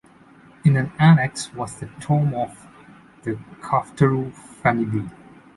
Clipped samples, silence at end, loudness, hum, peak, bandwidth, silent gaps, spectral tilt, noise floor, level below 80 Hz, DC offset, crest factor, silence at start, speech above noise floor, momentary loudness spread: under 0.1%; 0.45 s; -21 LUFS; none; -4 dBFS; 11.5 kHz; none; -7 dB/octave; -50 dBFS; -54 dBFS; under 0.1%; 18 dB; 0.65 s; 29 dB; 17 LU